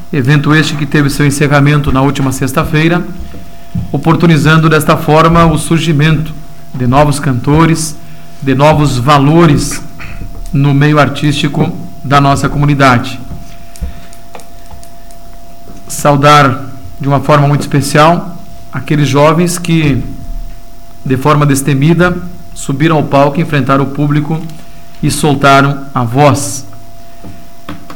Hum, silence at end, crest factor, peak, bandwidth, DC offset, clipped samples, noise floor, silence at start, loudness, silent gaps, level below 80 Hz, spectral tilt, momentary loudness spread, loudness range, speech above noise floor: none; 0 s; 10 dB; 0 dBFS; 17.5 kHz; 8%; under 0.1%; -34 dBFS; 0 s; -9 LUFS; none; -28 dBFS; -6 dB/octave; 18 LU; 4 LU; 25 dB